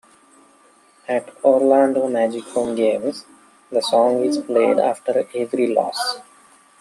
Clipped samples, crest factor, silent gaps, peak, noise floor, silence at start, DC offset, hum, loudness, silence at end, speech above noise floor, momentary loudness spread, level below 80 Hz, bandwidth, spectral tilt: under 0.1%; 18 dB; none; -2 dBFS; -53 dBFS; 1.1 s; under 0.1%; none; -19 LUFS; 0.6 s; 35 dB; 9 LU; -68 dBFS; 13 kHz; -4 dB/octave